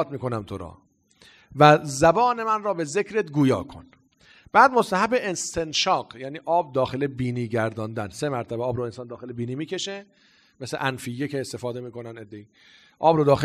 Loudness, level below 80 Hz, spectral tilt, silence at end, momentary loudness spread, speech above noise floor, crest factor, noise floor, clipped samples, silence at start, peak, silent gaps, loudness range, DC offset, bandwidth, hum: -23 LUFS; -56 dBFS; -5 dB/octave; 0 s; 19 LU; 33 dB; 24 dB; -56 dBFS; under 0.1%; 0 s; 0 dBFS; none; 10 LU; under 0.1%; 14.5 kHz; none